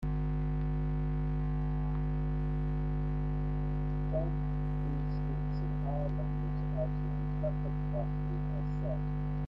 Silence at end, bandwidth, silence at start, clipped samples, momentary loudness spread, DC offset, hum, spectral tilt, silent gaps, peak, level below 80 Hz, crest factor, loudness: 0 s; 4.2 kHz; 0 s; under 0.1%; 1 LU; under 0.1%; 50 Hz at -35 dBFS; -11 dB/octave; none; -22 dBFS; -36 dBFS; 12 dB; -35 LUFS